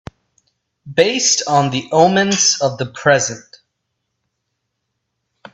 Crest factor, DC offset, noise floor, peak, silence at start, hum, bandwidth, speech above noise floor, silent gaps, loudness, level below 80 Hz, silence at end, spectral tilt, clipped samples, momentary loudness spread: 18 dB; under 0.1%; -74 dBFS; 0 dBFS; 0.85 s; none; 8.4 kHz; 59 dB; none; -15 LUFS; -56 dBFS; 2.15 s; -3 dB/octave; under 0.1%; 8 LU